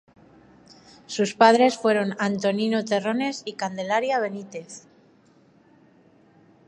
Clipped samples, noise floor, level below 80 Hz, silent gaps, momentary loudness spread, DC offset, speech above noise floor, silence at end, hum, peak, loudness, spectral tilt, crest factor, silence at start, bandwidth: under 0.1%; -57 dBFS; -74 dBFS; none; 19 LU; under 0.1%; 35 dB; 1.9 s; none; -2 dBFS; -23 LUFS; -4.5 dB/octave; 24 dB; 1.1 s; 11.5 kHz